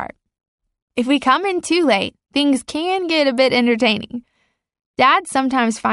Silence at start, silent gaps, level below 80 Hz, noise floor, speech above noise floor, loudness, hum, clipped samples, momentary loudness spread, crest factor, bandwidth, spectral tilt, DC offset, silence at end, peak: 0 s; 0.48-0.58 s, 0.82-0.88 s, 4.86-4.94 s; -58 dBFS; -67 dBFS; 51 dB; -17 LUFS; none; under 0.1%; 11 LU; 16 dB; 11.5 kHz; -3.5 dB/octave; under 0.1%; 0 s; -2 dBFS